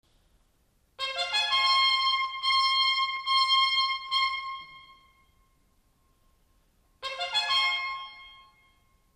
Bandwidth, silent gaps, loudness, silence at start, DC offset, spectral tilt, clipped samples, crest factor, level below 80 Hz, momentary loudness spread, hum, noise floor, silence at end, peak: 13.5 kHz; none; -25 LUFS; 1 s; under 0.1%; 2 dB/octave; under 0.1%; 16 dB; -66 dBFS; 15 LU; none; -68 dBFS; 0.8 s; -12 dBFS